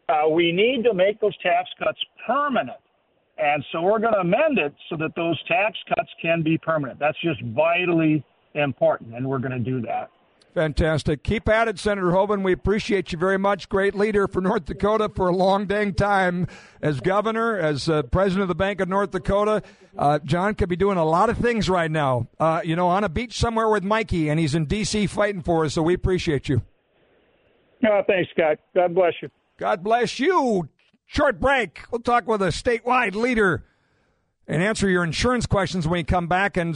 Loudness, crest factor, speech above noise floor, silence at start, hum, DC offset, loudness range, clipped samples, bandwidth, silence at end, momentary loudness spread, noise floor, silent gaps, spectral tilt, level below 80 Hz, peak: -22 LUFS; 16 dB; 45 dB; 0.1 s; none; under 0.1%; 2 LU; under 0.1%; 10.5 kHz; 0 s; 7 LU; -67 dBFS; none; -6 dB/octave; -40 dBFS; -6 dBFS